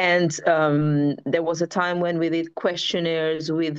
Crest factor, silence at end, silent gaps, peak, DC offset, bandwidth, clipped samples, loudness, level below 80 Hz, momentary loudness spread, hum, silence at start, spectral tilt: 16 dB; 0 s; none; -6 dBFS; under 0.1%; 8.2 kHz; under 0.1%; -22 LUFS; -68 dBFS; 5 LU; none; 0 s; -5.5 dB/octave